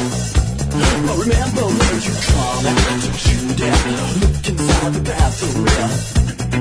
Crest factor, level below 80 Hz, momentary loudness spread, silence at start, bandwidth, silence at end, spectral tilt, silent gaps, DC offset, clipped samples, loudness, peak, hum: 14 dB; -22 dBFS; 3 LU; 0 s; 11 kHz; 0 s; -4.5 dB/octave; none; under 0.1%; under 0.1%; -17 LUFS; -2 dBFS; none